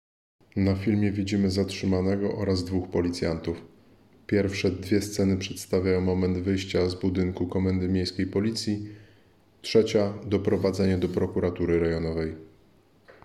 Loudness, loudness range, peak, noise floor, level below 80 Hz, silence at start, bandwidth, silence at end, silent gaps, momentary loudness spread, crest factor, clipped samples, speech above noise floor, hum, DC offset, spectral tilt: -26 LUFS; 2 LU; -8 dBFS; -60 dBFS; -54 dBFS; 0.55 s; 13.5 kHz; 0.15 s; none; 6 LU; 18 dB; under 0.1%; 34 dB; none; under 0.1%; -6.5 dB/octave